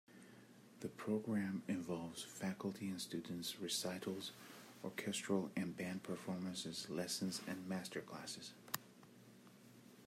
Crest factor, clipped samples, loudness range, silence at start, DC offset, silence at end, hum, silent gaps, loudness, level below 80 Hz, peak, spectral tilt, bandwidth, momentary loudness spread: 26 dB; under 0.1%; 2 LU; 0.1 s; under 0.1%; 0 s; none; none; -45 LUFS; -86 dBFS; -18 dBFS; -4 dB/octave; 16 kHz; 21 LU